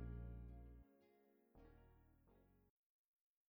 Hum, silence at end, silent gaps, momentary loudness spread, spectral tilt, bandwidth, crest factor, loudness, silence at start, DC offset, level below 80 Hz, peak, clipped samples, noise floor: none; 0.8 s; none; 15 LU; -9 dB/octave; over 20 kHz; 18 dB; -58 LUFS; 0 s; under 0.1%; -62 dBFS; -42 dBFS; under 0.1%; -77 dBFS